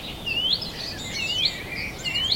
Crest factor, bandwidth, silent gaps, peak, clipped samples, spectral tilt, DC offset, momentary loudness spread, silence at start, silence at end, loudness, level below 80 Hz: 18 dB; 16.5 kHz; none; -10 dBFS; under 0.1%; -2 dB/octave; under 0.1%; 8 LU; 0 s; 0 s; -25 LUFS; -46 dBFS